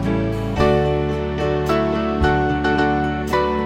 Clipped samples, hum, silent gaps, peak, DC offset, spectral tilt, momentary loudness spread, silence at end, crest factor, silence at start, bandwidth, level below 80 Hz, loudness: under 0.1%; none; none; -2 dBFS; under 0.1%; -7 dB/octave; 4 LU; 0 s; 16 dB; 0 s; 16 kHz; -30 dBFS; -19 LUFS